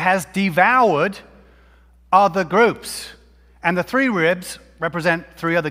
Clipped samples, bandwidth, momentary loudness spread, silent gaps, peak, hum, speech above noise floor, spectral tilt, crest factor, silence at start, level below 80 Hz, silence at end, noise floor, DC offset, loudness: under 0.1%; 16 kHz; 14 LU; none; 0 dBFS; none; 33 dB; -5 dB/octave; 18 dB; 0 s; -52 dBFS; 0 s; -51 dBFS; under 0.1%; -18 LUFS